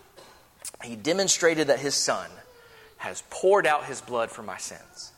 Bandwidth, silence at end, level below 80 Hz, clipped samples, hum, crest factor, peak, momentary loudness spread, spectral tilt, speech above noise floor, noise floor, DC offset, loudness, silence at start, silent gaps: 17.5 kHz; 0.1 s; -66 dBFS; under 0.1%; none; 20 dB; -8 dBFS; 17 LU; -2 dB/octave; 26 dB; -53 dBFS; under 0.1%; -25 LUFS; 0.2 s; none